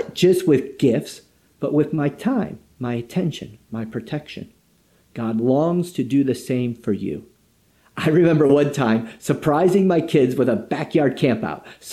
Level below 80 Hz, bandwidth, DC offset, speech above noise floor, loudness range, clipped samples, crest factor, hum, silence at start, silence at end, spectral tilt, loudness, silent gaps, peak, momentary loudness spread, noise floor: -58 dBFS; 14.5 kHz; under 0.1%; 40 dB; 7 LU; under 0.1%; 18 dB; none; 0 s; 0 s; -7 dB/octave; -20 LUFS; none; -4 dBFS; 15 LU; -59 dBFS